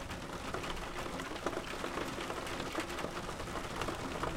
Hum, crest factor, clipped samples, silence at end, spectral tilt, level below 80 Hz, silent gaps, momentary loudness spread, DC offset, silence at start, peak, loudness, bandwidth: none; 18 dB; under 0.1%; 0 s; -4 dB/octave; -50 dBFS; none; 2 LU; under 0.1%; 0 s; -20 dBFS; -40 LUFS; 16.5 kHz